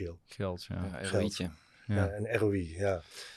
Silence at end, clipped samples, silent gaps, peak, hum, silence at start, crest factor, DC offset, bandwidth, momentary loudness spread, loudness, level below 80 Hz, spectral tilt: 0 s; under 0.1%; none; -14 dBFS; none; 0 s; 20 dB; under 0.1%; 13 kHz; 8 LU; -34 LUFS; -56 dBFS; -6 dB/octave